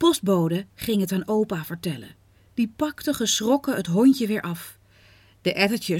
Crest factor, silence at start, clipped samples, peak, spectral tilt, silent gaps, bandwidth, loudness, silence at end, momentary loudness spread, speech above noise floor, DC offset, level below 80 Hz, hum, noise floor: 18 dB; 0 s; under 0.1%; -6 dBFS; -4.5 dB/octave; none; 17.5 kHz; -24 LUFS; 0 s; 13 LU; 32 dB; under 0.1%; -58 dBFS; none; -54 dBFS